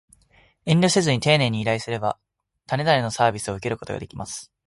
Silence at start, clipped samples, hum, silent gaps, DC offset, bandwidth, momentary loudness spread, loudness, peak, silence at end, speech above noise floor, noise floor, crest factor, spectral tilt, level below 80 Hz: 0.65 s; under 0.1%; none; none; under 0.1%; 11.5 kHz; 14 LU; -22 LUFS; -4 dBFS; 0.25 s; 37 dB; -58 dBFS; 20 dB; -4.5 dB/octave; -54 dBFS